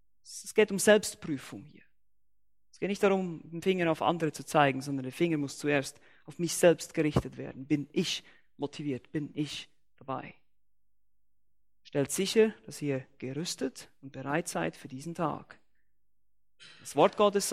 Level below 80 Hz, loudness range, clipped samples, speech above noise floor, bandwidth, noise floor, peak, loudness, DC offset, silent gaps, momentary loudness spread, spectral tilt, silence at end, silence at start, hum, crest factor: -62 dBFS; 8 LU; under 0.1%; 54 dB; 16 kHz; -84 dBFS; -8 dBFS; -30 LUFS; under 0.1%; none; 17 LU; -4.5 dB/octave; 0 s; 0.25 s; none; 22 dB